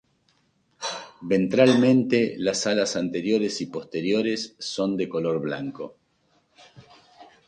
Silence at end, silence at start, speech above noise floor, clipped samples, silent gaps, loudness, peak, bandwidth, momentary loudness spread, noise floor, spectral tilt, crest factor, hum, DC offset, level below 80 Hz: 0.25 s; 0.8 s; 44 dB; under 0.1%; none; -24 LUFS; -4 dBFS; 9.8 kHz; 14 LU; -67 dBFS; -5 dB/octave; 20 dB; none; under 0.1%; -66 dBFS